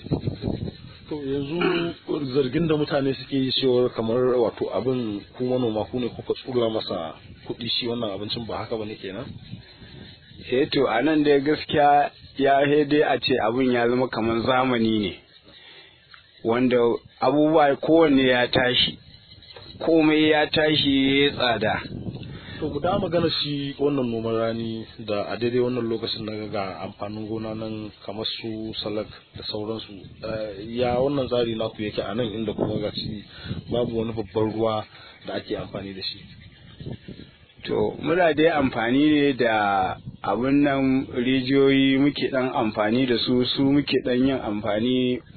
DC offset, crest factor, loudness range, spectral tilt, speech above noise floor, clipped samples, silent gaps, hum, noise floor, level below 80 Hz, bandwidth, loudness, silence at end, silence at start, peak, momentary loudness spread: under 0.1%; 18 dB; 9 LU; -9 dB/octave; 28 dB; under 0.1%; none; none; -51 dBFS; -52 dBFS; 4.6 kHz; -23 LUFS; 0.15 s; 0 s; -6 dBFS; 15 LU